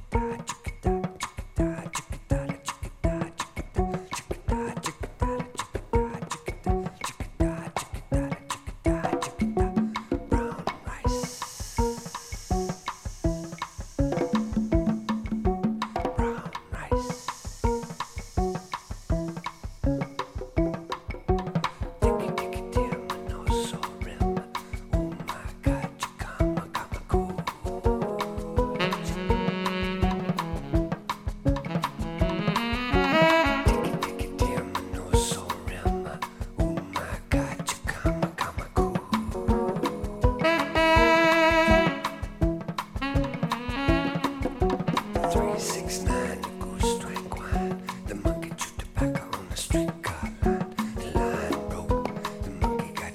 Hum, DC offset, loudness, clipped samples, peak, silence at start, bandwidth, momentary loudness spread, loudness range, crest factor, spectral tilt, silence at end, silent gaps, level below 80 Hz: none; under 0.1%; -28 LUFS; under 0.1%; -6 dBFS; 0 s; 16 kHz; 9 LU; 8 LU; 22 dB; -5.5 dB/octave; 0 s; none; -34 dBFS